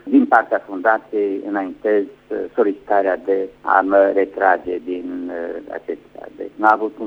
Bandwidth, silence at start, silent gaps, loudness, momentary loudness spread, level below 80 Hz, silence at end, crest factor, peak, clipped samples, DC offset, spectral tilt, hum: 5.8 kHz; 0.05 s; none; -19 LUFS; 14 LU; -60 dBFS; 0 s; 18 dB; 0 dBFS; under 0.1%; under 0.1%; -7.5 dB/octave; none